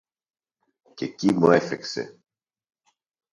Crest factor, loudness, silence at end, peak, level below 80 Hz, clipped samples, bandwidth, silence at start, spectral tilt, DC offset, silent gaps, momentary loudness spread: 24 dB; -23 LUFS; 1.2 s; -4 dBFS; -66 dBFS; under 0.1%; 11 kHz; 1 s; -6 dB/octave; under 0.1%; none; 16 LU